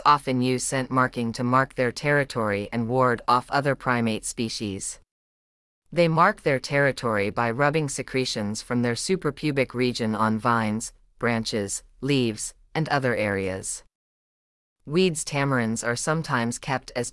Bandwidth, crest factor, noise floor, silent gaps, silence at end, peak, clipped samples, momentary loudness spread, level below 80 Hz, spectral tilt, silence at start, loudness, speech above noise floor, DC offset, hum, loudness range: 12 kHz; 20 dB; under -90 dBFS; 5.11-5.82 s, 13.95-14.76 s; 0 s; -6 dBFS; under 0.1%; 7 LU; -54 dBFS; -4.5 dB/octave; 0 s; -25 LUFS; over 66 dB; under 0.1%; none; 3 LU